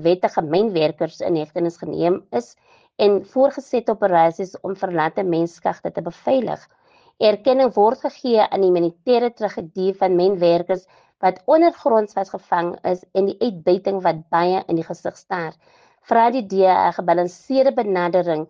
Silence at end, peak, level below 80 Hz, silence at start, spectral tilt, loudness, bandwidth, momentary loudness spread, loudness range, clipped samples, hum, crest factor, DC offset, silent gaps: 0.05 s; -4 dBFS; -66 dBFS; 0 s; -7 dB/octave; -19 LUFS; 7.4 kHz; 10 LU; 3 LU; under 0.1%; none; 16 dB; under 0.1%; none